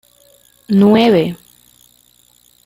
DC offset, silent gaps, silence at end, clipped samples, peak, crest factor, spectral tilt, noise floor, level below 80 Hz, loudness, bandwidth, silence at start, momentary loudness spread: under 0.1%; none; 1.3 s; under 0.1%; -2 dBFS; 16 dB; -7.5 dB/octave; -52 dBFS; -56 dBFS; -12 LUFS; 16 kHz; 0.7 s; 14 LU